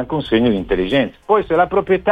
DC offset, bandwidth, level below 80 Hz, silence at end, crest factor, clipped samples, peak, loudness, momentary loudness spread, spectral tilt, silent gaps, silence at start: under 0.1%; 5 kHz; -38 dBFS; 0 s; 14 dB; under 0.1%; -2 dBFS; -17 LUFS; 3 LU; -8 dB/octave; none; 0 s